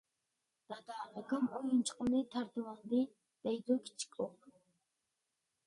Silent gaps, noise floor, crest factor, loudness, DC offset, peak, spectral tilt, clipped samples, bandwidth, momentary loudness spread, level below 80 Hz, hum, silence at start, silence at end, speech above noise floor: none; -87 dBFS; 18 dB; -38 LUFS; under 0.1%; -22 dBFS; -4.5 dB/octave; under 0.1%; 11.5 kHz; 12 LU; -76 dBFS; none; 0.7 s; 1.15 s; 49 dB